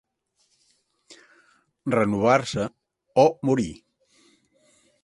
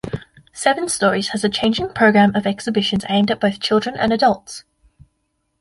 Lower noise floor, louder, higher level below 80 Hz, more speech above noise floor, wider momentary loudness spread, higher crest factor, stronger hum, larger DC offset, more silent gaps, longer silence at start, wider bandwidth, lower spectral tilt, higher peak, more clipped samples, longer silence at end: about the same, -70 dBFS vs -70 dBFS; second, -23 LUFS vs -18 LUFS; second, -58 dBFS vs -50 dBFS; second, 49 dB vs 53 dB; first, 13 LU vs 10 LU; first, 22 dB vs 16 dB; neither; neither; neither; first, 1.85 s vs 0.05 s; about the same, 11.5 kHz vs 11.5 kHz; first, -6 dB/octave vs -4.5 dB/octave; about the same, -4 dBFS vs -2 dBFS; neither; first, 1.3 s vs 1 s